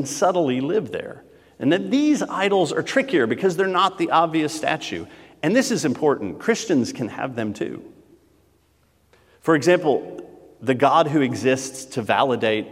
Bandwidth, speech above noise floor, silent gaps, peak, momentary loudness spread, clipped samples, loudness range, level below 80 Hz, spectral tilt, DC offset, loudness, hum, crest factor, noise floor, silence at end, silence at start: 15.5 kHz; 41 dB; none; -2 dBFS; 12 LU; under 0.1%; 5 LU; -66 dBFS; -5 dB/octave; under 0.1%; -21 LUFS; none; 18 dB; -61 dBFS; 0 s; 0 s